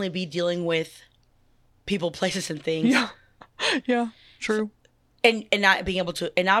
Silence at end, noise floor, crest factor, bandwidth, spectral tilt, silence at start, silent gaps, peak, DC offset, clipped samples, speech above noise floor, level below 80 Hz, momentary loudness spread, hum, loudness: 0 s; -61 dBFS; 24 dB; 14 kHz; -4 dB/octave; 0 s; none; -2 dBFS; under 0.1%; under 0.1%; 37 dB; -54 dBFS; 11 LU; none; -24 LUFS